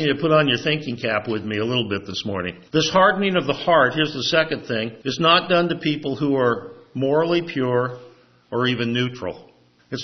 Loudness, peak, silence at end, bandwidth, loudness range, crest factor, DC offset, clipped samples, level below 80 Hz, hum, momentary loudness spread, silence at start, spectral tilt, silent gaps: -21 LUFS; -2 dBFS; 0 s; 6.4 kHz; 4 LU; 18 dB; under 0.1%; under 0.1%; -60 dBFS; none; 11 LU; 0 s; -5 dB/octave; none